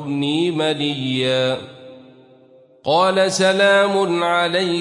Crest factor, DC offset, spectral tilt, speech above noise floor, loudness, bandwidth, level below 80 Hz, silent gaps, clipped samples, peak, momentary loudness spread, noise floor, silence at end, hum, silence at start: 16 dB; under 0.1%; -4.5 dB/octave; 32 dB; -17 LUFS; 11.5 kHz; -66 dBFS; none; under 0.1%; -4 dBFS; 8 LU; -50 dBFS; 0 s; none; 0 s